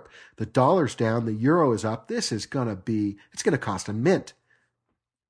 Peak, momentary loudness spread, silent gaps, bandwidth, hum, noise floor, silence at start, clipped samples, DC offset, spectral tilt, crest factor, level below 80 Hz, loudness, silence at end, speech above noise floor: -6 dBFS; 8 LU; none; 11 kHz; none; -80 dBFS; 0.4 s; under 0.1%; under 0.1%; -6 dB/octave; 20 dB; -62 dBFS; -25 LUFS; 1 s; 56 dB